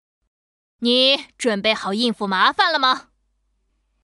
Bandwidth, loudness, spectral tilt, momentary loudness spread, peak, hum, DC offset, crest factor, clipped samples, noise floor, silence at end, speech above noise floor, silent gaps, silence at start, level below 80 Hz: 12 kHz; -18 LUFS; -3 dB/octave; 7 LU; -4 dBFS; none; under 0.1%; 18 dB; under 0.1%; -68 dBFS; 1.05 s; 49 dB; none; 0.8 s; -66 dBFS